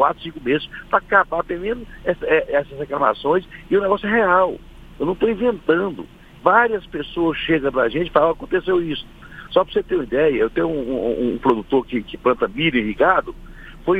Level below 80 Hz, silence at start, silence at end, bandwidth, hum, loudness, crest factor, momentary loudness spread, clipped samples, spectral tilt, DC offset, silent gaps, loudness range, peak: -42 dBFS; 0 s; 0 s; 7.4 kHz; none; -20 LUFS; 20 dB; 10 LU; under 0.1%; -7.5 dB/octave; under 0.1%; none; 1 LU; 0 dBFS